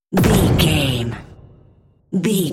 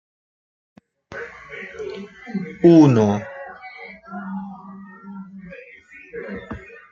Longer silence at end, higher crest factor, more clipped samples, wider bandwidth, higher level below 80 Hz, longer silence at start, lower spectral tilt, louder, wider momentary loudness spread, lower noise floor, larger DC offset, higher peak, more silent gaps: second, 0 s vs 0.35 s; about the same, 16 dB vs 20 dB; neither; first, 16.5 kHz vs 7.2 kHz; first, -32 dBFS vs -58 dBFS; second, 0.1 s vs 1.1 s; second, -5.5 dB/octave vs -8 dB/octave; about the same, -17 LUFS vs -17 LUFS; second, 12 LU vs 26 LU; first, -52 dBFS vs -45 dBFS; neither; about the same, -2 dBFS vs -2 dBFS; neither